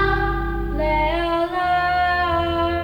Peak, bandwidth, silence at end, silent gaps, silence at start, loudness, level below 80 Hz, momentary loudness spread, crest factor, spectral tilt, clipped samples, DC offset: -6 dBFS; 17 kHz; 0 s; none; 0 s; -20 LUFS; -30 dBFS; 5 LU; 14 dB; -7 dB/octave; under 0.1%; under 0.1%